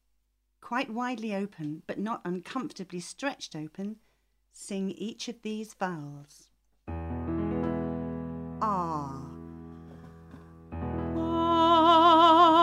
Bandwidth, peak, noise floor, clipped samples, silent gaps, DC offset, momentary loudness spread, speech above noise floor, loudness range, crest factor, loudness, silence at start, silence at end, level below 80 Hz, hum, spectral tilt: 12.5 kHz; -8 dBFS; -74 dBFS; under 0.1%; none; under 0.1%; 23 LU; 39 dB; 11 LU; 20 dB; -28 LUFS; 0.65 s; 0 s; -52 dBFS; none; -5.5 dB/octave